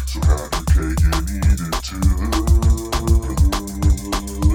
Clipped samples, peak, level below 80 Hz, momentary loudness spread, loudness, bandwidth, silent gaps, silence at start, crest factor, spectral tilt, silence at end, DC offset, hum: under 0.1%; -4 dBFS; -18 dBFS; 4 LU; -19 LUFS; 17.5 kHz; none; 0 s; 12 dB; -5.5 dB/octave; 0 s; under 0.1%; none